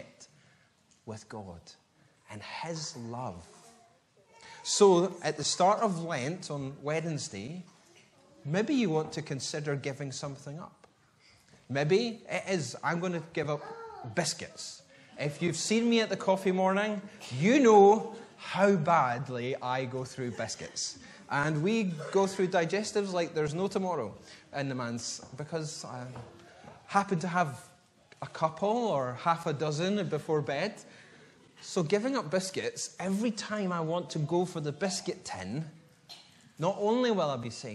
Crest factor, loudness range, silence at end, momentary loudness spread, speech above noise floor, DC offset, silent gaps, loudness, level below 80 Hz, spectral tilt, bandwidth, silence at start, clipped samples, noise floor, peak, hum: 22 dB; 9 LU; 0 s; 17 LU; 36 dB; under 0.1%; none; -30 LUFS; -72 dBFS; -5 dB/octave; 12.5 kHz; 0 s; under 0.1%; -66 dBFS; -10 dBFS; none